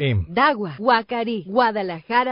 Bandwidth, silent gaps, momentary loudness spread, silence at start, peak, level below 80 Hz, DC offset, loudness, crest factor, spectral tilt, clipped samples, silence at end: 5.4 kHz; none; 6 LU; 0 s; -4 dBFS; -42 dBFS; under 0.1%; -21 LUFS; 16 dB; -11 dB/octave; under 0.1%; 0 s